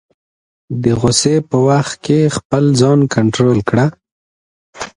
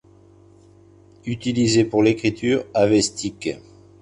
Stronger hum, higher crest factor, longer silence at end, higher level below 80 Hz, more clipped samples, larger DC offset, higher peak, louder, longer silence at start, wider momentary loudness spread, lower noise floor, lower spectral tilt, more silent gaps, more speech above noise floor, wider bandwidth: neither; about the same, 14 dB vs 18 dB; second, 0.05 s vs 0.4 s; first, -44 dBFS vs -52 dBFS; neither; neither; first, 0 dBFS vs -4 dBFS; first, -13 LUFS vs -20 LUFS; second, 0.7 s vs 1.25 s; second, 6 LU vs 13 LU; first, under -90 dBFS vs -50 dBFS; about the same, -5.5 dB/octave vs -5 dB/octave; first, 2.45-2.50 s, 4.12-4.73 s vs none; first, over 77 dB vs 31 dB; about the same, 11 kHz vs 11 kHz